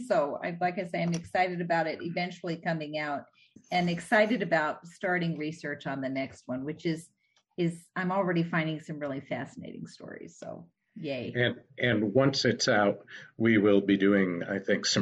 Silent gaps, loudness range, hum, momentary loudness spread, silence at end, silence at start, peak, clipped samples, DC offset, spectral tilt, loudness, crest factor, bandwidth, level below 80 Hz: none; 8 LU; none; 16 LU; 0 s; 0 s; -10 dBFS; under 0.1%; under 0.1%; -5 dB/octave; -29 LUFS; 18 dB; 11.5 kHz; -68 dBFS